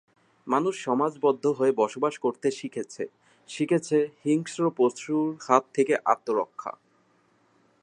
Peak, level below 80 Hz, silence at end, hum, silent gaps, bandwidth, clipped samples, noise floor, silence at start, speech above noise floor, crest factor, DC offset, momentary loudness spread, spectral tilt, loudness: -4 dBFS; -80 dBFS; 1.1 s; none; none; 10.5 kHz; under 0.1%; -65 dBFS; 0.45 s; 39 dB; 22 dB; under 0.1%; 12 LU; -5.5 dB/octave; -26 LUFS